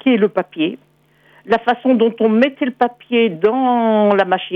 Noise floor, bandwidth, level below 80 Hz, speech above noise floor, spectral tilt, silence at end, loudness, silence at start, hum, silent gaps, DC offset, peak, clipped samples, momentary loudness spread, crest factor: -52 dBFS; 5.4 kHz; -62 dBFS; 36 dB; -8 dB/octave; 0 s; -16 LUFS; 0.05 s; none; none; under 0.1%; -2 dBFS; under 0.1%; 6 LU; 14 dB